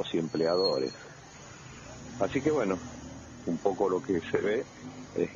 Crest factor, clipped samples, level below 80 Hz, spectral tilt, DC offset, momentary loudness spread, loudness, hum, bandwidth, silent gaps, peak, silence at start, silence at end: 20 dB; under 0.1%; -60 dBFS; -5.5 dB/octave; under 0.1%; 19 LU; -30 LUFS; none; 7.4 kHz; none; -12 dBFS; 0 s; 0 s